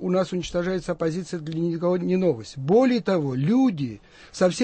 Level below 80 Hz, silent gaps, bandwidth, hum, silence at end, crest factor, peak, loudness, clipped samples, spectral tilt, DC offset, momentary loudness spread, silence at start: -52 dBFS; none; 8.8 kHz; none; 0 s; 14 dB; -8 dBFS; -24 LUFS; under 0.1%; -6.5 dB/octave; under 0.1%; 11 LU; 0 s